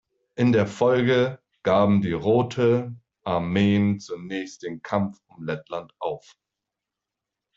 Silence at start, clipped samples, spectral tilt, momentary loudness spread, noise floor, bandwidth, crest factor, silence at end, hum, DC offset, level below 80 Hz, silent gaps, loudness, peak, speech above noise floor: 0.35 s; under 0.1%; -7.5 dB/octave; 15 LU; -86 dBFS; 7.8 kHz; 16 dB; 1.4 s; none; under 0.1%; -60 dBFS; none; -23 LUFS; -8 dBFS; 63 dB